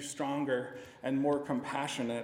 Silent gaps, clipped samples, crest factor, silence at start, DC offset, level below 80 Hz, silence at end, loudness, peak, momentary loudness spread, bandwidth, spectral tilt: none; under 0.1%; 16 dB; 0 s; under 0.1%; -74 dBFS; 0 s; -34 LUFS; -18 dBFS; 6 LU; 16 kHz; -5 dB/octave